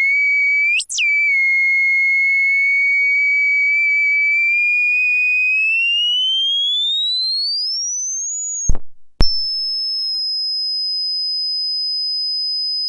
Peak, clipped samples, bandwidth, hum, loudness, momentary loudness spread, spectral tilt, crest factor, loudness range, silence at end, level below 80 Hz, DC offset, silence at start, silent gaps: 0 dBFS; under 0.1%; 11.5 kHz; 50 Hz at -55 dBFS; -14 LUFS; 6 LU; 1 dB/octave; 16 dB; 6 LU; 0 s; -32 dBFS; under 0.1%; 0 s; none